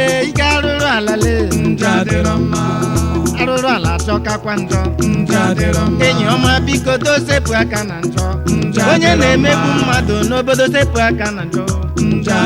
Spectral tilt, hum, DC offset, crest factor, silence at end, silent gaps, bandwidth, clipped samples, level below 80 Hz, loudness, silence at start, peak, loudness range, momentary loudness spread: -5 dB/octave; none; under 0.1%; 14 dB; 0 s; none; 16.5 kHz; under 0.1%; -26 dBFS; -14 LUFS; 0 s; 0 dBFS; 2 LU; 6 LU